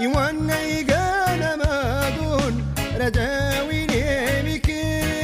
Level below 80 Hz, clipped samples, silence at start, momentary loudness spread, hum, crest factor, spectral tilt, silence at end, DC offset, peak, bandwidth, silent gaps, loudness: -32 dBFS; under 0.1%; 0 s; 3 LU; none; 14 dB; -5 dB/octave; 0 s; under 0.1%; -8 dBFS; 16 kHz; none; -22 LUFS